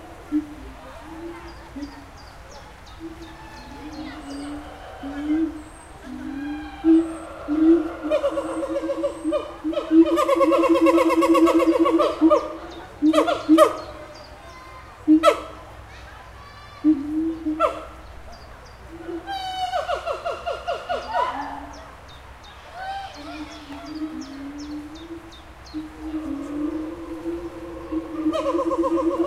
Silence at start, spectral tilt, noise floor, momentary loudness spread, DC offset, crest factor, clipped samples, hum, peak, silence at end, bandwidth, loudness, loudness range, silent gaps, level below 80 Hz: 0 s; -5.5 dB/octave; -42 dBFS; 24 LU; under 0.1%; 22 dB; under 0.1%; none; -2 dBFS; 0 s; 13.5 kHz; -22 LUFS; 17 LU; none; -46 dBFS